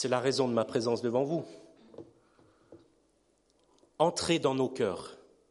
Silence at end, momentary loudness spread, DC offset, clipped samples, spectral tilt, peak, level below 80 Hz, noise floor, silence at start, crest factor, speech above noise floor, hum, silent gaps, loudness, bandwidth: 0.35 s; 20 LU; under 0.1%; under 0.1%; -5 dB/octave; -12 dBFS; -70 dBFS; -71 dBFS; 0 s; 20 dB; 41 dB; none; none; -30 LUFS; 11.5 kHz